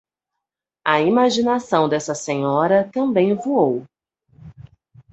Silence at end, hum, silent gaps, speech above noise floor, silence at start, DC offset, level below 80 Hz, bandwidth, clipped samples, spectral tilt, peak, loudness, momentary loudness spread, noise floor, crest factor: 0.5 s; none; none; 65 dB; 0.85 s; under 0.1%; -60 dBFS; 8.2 kHz; under 0.1%; -5.5 dB/octave; -2 dBFS; -19 LUFS; 7 LU; -83 dBFS; 18 dB